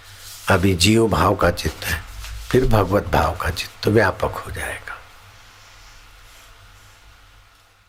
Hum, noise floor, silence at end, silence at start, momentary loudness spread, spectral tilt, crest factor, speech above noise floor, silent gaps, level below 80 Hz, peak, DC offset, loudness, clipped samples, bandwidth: none; -52 dBFS; 2.85 s; 0.05 s; 17 LU; -5 dB/octave; 18 dB; 33 dB; none; -34 dBFS; -4 dBFS; under 0.1%; -19 LUFS; under 0.1%; 16.5 kHz